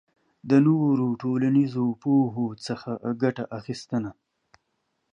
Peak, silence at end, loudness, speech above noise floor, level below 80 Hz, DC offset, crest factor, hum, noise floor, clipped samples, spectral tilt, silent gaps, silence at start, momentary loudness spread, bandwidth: -6 dBFS; 1 s; -25 LUFS; 52 dB; -68 dBFS; under 0.1%; 18 dB; none; -76 dBFS; under 0.1%; -8 dB/octave; none; 0.45 s; 13 LU; 9.6 kHz